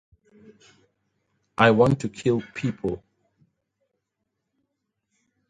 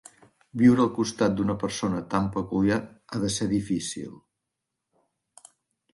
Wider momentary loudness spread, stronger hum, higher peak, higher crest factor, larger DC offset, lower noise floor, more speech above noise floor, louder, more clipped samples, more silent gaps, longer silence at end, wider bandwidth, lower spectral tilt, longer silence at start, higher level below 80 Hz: about the same, 16 LU vs 14 LU; neither; first, 0 dBFS vs -8 dBFS; first, 26 dB vs 20 dB; neither; second, -80 dBFS vs -84 dBFS; about the same, 58 dB vs 59 dB; first, -22 LUFS vs -25 LUFS; neither; neither; first, 2.5 s vs 1.75 s; about the same, 11 kHz vs 11.5 kHz; about the same, -6.5 dB/octave vs -5.5 dB/octave; first, 1.6 s vs 0.55 s; about the same, -56 dBFS vs -54 dBFS